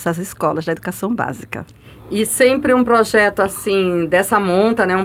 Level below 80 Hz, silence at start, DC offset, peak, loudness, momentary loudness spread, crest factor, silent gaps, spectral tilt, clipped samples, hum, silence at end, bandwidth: -48 dBFS; 0 s; under 0.1%; -2 dBFS; -16 LUFS; 10 LU; 14 dB; none; -4.5 dB/octave; under 0.1%; none; 0 s; 17 kHz